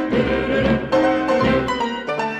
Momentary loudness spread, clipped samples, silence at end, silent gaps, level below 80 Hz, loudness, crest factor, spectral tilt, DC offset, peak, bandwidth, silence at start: 5 LU; under 0.1%; 0 s; none; -38 dBFS; -19 LUFS; 12 dB; -6.5 dB/octave; under 0.1%; -6 dBFS; 9.2 kHz; 0 s